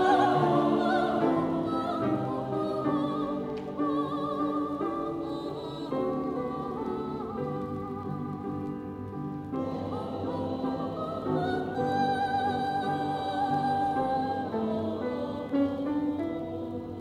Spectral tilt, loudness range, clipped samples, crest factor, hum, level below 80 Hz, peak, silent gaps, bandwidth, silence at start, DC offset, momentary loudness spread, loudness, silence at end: -7.5 dB/octave; 6 LU; under 0.1%; 18 dB; none; -58 dBFS; -12 dBFS; none; 11.5 kHz; 0 s; under 0.1%; 9 LU; -30 LUFS; 0 s